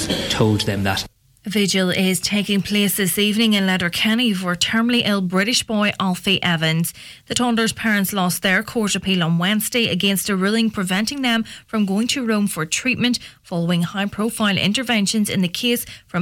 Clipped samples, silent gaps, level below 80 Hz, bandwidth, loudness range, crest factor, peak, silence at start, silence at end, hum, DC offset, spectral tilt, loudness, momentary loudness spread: under 0.1%; none; -50 dBFS; 17.5 kHz; 2 LU; 14 dB; -6 dBFS; 0 s; 0 s; none; under 0.1%; -4 dB/octave; -19 LUFS; 5 LU